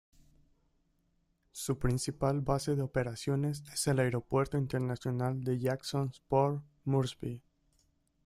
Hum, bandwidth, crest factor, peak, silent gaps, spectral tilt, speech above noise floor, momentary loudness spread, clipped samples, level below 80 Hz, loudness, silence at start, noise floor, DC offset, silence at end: none; 14.5 kHz; 18 dB; -16 dBFS; none; -6 dB/octave; 42 dB; 7 LU; under 0.1%; -54 dBFS; -33 LUFS; 1.55 s; -75 dBFS; under 0.1%; 0.85 s